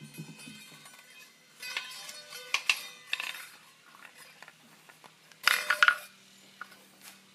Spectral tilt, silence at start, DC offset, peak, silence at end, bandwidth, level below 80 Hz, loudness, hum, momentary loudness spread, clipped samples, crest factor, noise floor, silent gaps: 0 dB/octave; 0 s; under 0.1%; -4 dBFS; 0.2 s; 15.5 kHz; under -90 dBFS; -30 LUFS; none; 26 LU; under 0.1%; 32 dB; -57 dBFS; none